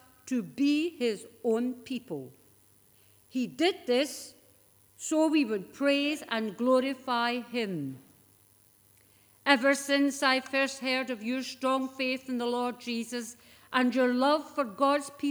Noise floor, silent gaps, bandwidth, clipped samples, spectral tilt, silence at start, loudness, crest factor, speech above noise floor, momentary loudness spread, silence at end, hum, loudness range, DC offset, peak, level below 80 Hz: -62 dBFS; none; over 20 kHz; under 0.1%; -3.5 dB/octave; 0.25 s; -29 LUFS; 24 dB; 33 dB; 12 LU; 0 s; none; 5 LU; under 0.1%; -6 dBFS; -78 dBFS